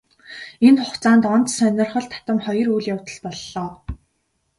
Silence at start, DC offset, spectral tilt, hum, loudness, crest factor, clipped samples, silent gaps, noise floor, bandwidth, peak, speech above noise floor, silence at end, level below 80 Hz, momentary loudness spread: 0.3 s; under 0.1%; -5 dB/octave; none; -19 LUFS; 18 dB; under 0.1%; none; -70 dBFS; 11.5 kHz; -2 dBFS; 52 dB; 0.65 s; -46 dBFS; 21 LU